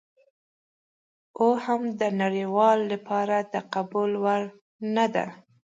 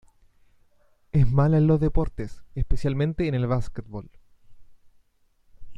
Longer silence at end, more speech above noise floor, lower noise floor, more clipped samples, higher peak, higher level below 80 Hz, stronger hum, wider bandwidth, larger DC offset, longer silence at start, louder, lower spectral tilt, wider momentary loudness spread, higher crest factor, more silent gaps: first, 0.45 s vs 0 s; first, over 65 dB vs 40 dB; first, under -90 dBFS vs -62 dBFS; neither; about the same, -8 dBFS vs -8 dBFS; second, -78 dBFS vs -34 dBFS; neither; about the same, 7.8 kHz vs 7.8 kHz; neither; first, 1.35 s vs 1.15 s; about the same, -25 LUFS vs -24 LUFS; second, -6.5 dB/octave vs -9.5 dB/octave; second, 9 LU vs 17 LU; about the same, 18 dB vs 16 dB; first, 4.61-4.79 s vs none